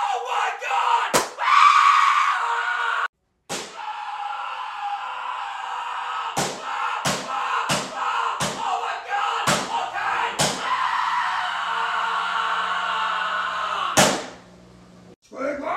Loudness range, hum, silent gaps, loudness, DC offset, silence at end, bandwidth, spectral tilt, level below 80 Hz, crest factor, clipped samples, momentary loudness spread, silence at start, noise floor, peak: 9 LU; none; 3.09-3.13 s, 15.16-15.22 s; -22 LUFS; under 0.1%; 0 s; 16 kHz; -2 dB/octave; -60 dBFS; 22 dB; under 0.1%; 12 LU; 0 s; -48 dBFS; -2 dBFS